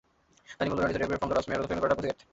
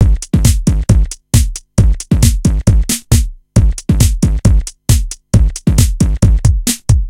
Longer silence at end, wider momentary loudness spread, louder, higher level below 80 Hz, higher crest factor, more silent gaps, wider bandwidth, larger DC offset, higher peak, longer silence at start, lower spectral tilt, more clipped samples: first, 0.2 s vs 0 s; about the same, 3 LU vs 3 LU; second, -30 LUFS vs -13 LUFS; second, -52 dBFS vs -14 dBFS; first, 20 dB vs 10 dB; neither; second, 8 kHz vs 16.5 kHz; neither; second, -12 dBFS vs 0 dBFS; first, 0.5 s vs 0 s; about the same, -6 dB/octave vs -5.5 dB/octave; second, under 0.1% vs 0.5%